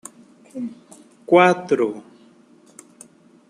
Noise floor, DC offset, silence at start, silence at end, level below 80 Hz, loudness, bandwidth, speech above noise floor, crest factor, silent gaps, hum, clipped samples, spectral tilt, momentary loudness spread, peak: -52 dBFS; under 0.1%; 0.55 s; 1.5 s; -72 dBFS; -19 LUFS; 11 kHz; 33 dB; 22 dB; none; none; under 0.1%; -5.5 dB/octave; 25 LU; -2 dBFS